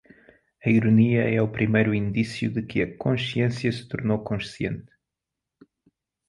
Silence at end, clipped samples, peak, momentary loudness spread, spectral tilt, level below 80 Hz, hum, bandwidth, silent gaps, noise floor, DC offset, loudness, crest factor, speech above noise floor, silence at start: 1.5 s; under 0.1%; -6 dBFS; 11 LU; -7.5 dB/octave; -54 dBFS; none; 11.5 kHz; none; -86 dBFS; under 0.1%; -24 LUFS; 20 dB; 63 dB; 0.65 s